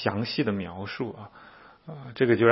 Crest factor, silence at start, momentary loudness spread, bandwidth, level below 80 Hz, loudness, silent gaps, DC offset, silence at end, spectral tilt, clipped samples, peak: 22 dB; 0 s; 22 LU; 5.8 kHz; -64 dBFS; -28 LUFS; none; under 0.1%; 0 s; -10.5 dB/octave; under 0.1%; -4 dBFS